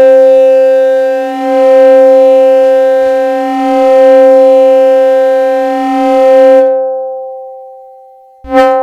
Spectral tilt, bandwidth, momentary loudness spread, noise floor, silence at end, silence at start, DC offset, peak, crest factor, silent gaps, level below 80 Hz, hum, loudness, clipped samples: -4.5 dB/octave; 7.6 kHz; 9 LU; -37 dBFS; 0 s; 0 s; under 0.1%; 0 dBFS; 6 dB; none; -48 dBFS; none; -6 LUFS; 2%